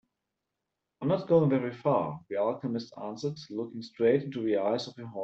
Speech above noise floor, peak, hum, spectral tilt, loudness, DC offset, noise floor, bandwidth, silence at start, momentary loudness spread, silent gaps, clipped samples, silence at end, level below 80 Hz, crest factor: 56 dB; -10 dBFS; none; -7.5 dB/octave; -30 LUFS; under 0.1%; -86 dBFS; 7.8 kHz; 1 s; 13 LU; none; under 0.1%; 0 s; -72 dBFS; 20 dB